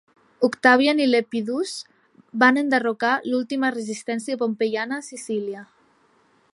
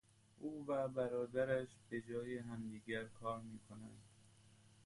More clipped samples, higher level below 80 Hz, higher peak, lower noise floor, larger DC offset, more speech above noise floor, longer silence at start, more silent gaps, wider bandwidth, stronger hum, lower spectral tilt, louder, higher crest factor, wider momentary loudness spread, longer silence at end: neither; about the same, -76 dBFS vs -74 dBFS; first, -2 dBFS vs -26 dBFS; second, -61 dBFS vs -67 dBFS; neither; first, 39 dB vs 24 dB; about the same, 0.4 s vs 0.35 s; neither; about the same, 11.5 kHz vs 11.5 kHz; neither; second, -4 dB/octave vs -6.5 dB/octave; first, -22 LUFS vs -44 LUFS; about the same, 20 dB vs 18 dB; second, 13 LU vs 16 LU; first, 0.9 s vs 0.15 s